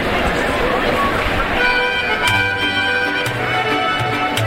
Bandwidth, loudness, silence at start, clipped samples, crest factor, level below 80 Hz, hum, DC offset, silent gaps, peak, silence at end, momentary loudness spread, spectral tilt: 16.5 kHz; -16 LUFS; 0 s; under 0.1%; 14 dB; -32 dBFS; none; under 0.1%; none; -4 dBFS; 0 s; 3 LU; -4 dB/octave